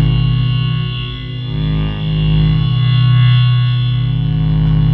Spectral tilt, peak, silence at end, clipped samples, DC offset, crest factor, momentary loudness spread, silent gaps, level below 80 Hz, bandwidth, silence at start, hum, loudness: -10 dB/octave; -2 dBFS; 0 s; under 0.1%; under 0.1%; 10 dB; 9 LU; none; -24 dBFS; 4.5 kHz; 0 s; none; -14 LUFS